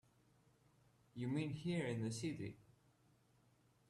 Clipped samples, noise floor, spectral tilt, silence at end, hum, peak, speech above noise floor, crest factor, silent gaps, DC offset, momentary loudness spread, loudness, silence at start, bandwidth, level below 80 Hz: under 0.1%; -75 dBFS; -6 dB/octave; 1.3 s; none; -30 dBFS; 32 dB; 18 dB; none; under 0.1%; 9 LU; -44 LUFS; 1.15 s; 13 kHz; -76 dBFS